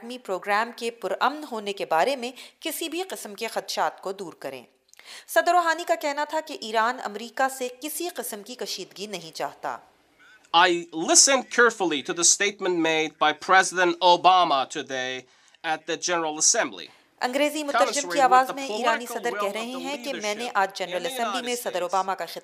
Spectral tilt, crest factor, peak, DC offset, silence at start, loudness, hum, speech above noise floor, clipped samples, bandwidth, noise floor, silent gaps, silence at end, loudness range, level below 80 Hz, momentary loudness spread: -1 dB/octave; 22 dB; -2 dBFS; under 0.1%; 0 s; -24 LUFS; none; 31 dB; under 0.1%; 16 kHz; -56 dBFS; none; 0.05 s; 9 LU; -84 dBFS; 16 LU